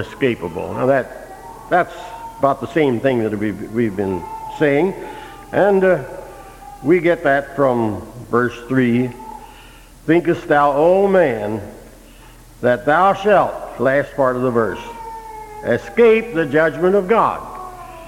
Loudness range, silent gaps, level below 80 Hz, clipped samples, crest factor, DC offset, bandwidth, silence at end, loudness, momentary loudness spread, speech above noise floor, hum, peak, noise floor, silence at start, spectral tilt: 3 LU; none; -46 dBFS; under 0.1%; 18 dB; under 0.1%; 16.5 kHz; 0 s; -17 LUFS; 19 LU; 25 dB; none; 0 dBFS; -42 dBFS; 0 s; -7 dB/octave